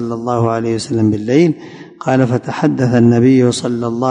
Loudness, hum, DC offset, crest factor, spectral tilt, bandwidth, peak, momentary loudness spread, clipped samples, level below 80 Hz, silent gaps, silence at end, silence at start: -14 LUFS; none; under 0.1%; 12 dB; -7 dB/octave; 10.5 kHz; 0 dBFS; 8 LU; under 0.1%; -48 dBFS; none; 0 s; 0 s